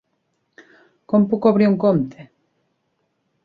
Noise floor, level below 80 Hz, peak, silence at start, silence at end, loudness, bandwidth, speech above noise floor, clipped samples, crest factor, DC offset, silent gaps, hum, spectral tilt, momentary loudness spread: -71 dBFS; -62 dBFS; -4 dBFS; 1.1 s; 1.25 s; -18 LUFS; 4.9 kHz; 54 dB; under 0.1%; 18 dB; under 0.1%; none; none; -10.5 dB/octave; 6 LU